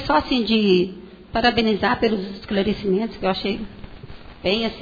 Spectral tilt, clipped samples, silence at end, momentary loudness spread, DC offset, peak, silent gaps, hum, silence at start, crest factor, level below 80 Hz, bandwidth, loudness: -7 dB/octave; under 0.1%; 0 s; 17 LU; under 0.1%; -4 dBFS; none; none; 0 s; 16 dB; -42 dBFS; 5 kHz; -21 LUFS